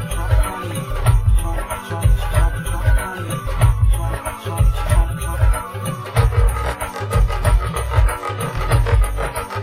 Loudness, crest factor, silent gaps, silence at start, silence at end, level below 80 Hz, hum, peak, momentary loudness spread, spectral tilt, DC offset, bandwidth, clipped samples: -20 LUFS; 14 dB; none; 0 s; 0 s; -20 dBFS; none; -2 dBFS; 8 LU; -5.5 dB/octave; under 0.1%; 15.5 kHz; under 0.1%